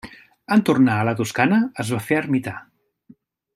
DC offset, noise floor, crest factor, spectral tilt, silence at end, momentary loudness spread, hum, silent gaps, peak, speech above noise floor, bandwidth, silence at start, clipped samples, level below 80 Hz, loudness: under 0.1%; -53 dBFS; 18 dB; -6 dB/octave; 0.95 s; 8 LU; none; none; -2 dBFS; 34 dB; 14.5 kHz; 0.05 s; under 0.1%; -62 dBFS; -20 LUFS